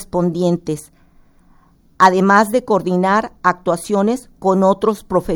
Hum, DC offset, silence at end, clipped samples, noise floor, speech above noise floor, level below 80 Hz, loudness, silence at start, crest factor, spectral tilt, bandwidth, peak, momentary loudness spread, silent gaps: none; under 0.1%; 0 s; under 0.1%; -51 dBFS; 35 dB; -46 dBFS; -16 LUFS; 0 s; 16 dB; -6 dB/octave; over 20 kHz; 0 dBFS; 8 LU; none